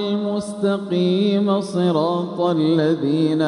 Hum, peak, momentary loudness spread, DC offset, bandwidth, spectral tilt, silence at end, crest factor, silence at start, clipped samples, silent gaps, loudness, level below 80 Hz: none; -6 dBFS; 4 LU; under 0.1%; 11 kHz; -7.5 dB/octave; 0 s; 12 dB; 0 s; under 0.1%; none; -20 LUFS; -64 dBFS